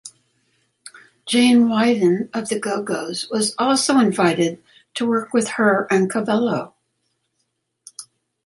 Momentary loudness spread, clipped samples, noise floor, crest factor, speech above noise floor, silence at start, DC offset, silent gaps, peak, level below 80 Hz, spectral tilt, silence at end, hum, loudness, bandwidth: 22 LU; under 0.1%; -73 dBFS; 18 dB; 55 dB; 0.05 s; under 0.1%; none; -2 dBFS; -68 dBFS; -4.5 dB/octave; 0.45 s; none; -19 LUFS; 11.5 kHz